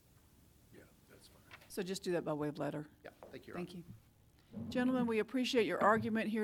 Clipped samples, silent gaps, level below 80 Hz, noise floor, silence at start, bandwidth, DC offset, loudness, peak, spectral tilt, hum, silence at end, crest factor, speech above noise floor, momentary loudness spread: under 0.1%; none; -72 dBFS; -66 dBFS; 0.7 s; 18.5 kHz; under 0.1%; -37 LUFS; -16 dBFS; -5.5 dB/octave; none; 0 s; 22 dB; 29 dB; 22 LU